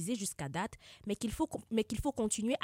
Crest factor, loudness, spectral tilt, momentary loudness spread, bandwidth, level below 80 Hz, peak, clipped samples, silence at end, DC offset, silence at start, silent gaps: 16 dB; -37 LUFS; -4.5 dB/octave; 7 LU; 16 kHz; -52 dBFS; -20 dBFS; under 0.1%; 0.05 s; under 0.1%; 0 s; none